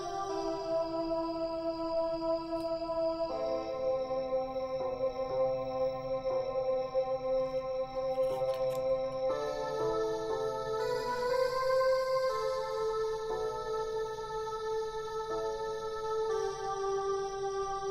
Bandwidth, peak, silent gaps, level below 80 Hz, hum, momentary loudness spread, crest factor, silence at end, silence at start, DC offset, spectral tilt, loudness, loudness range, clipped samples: 14 kHz; -20 dBFS; none; -56 dBFS; none; 5 LU; 14 dB; 0 s; 0 s; under 0.1%; -4.5 dB/octave; -34 LUFS; 3 LU; under 0.1%